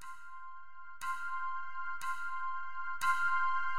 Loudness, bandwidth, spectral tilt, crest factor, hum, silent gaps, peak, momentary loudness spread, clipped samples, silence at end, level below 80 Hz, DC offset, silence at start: -36 LUFS; 16 kHz; 0 dB/octave; 18 dB; none; none; -18 dBFS; 19 LU; under 0.1%; 0 s; -70 dBFS; 1%; 0 s